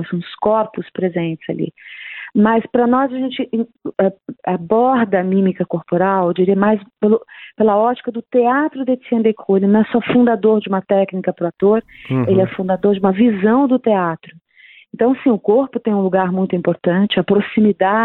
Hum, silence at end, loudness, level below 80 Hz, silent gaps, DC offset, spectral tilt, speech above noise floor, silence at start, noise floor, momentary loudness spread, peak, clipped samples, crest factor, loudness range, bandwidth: none; 0 s; -16 LUFS; -58 dBFS; none; under 0.1%; -11 dB/octave; 30 dB; 0 s; -46 dBFS; 9 LU; -2 dBFS; under 0.1%; 14 dB; 3 LU; 4.1 kHz